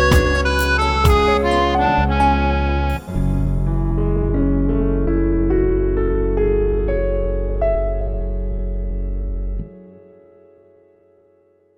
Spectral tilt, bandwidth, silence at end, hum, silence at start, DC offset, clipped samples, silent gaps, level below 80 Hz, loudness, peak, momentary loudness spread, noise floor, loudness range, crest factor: -6.5 dB/octave; 16 kHz; 1.85 s; none; 0 s; under 0.1%; under 0.1%; none; -22 dBFS; -19 LUFS; -2 dBFS; 11 LU; -56 dBFS; 11 LU; 16 dB